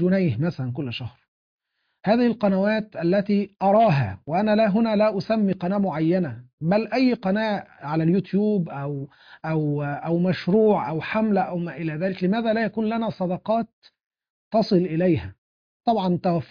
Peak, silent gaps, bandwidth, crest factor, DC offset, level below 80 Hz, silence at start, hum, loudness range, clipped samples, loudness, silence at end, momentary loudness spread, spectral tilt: -8 dBFS; 1.28-1.59 s, 6.53-6.58 s, 13.73-13.82 s, 14.06-14.11 s, 14.30-14.51 s, 15.38-15.80 s; 5.2 kHz; 16 dB; under 0.1%; -60 dBFS; 0 s; none; 4 LU; under 0.1%; -23 LUFS; 0.05 s; 10 LU; -9 dB/octave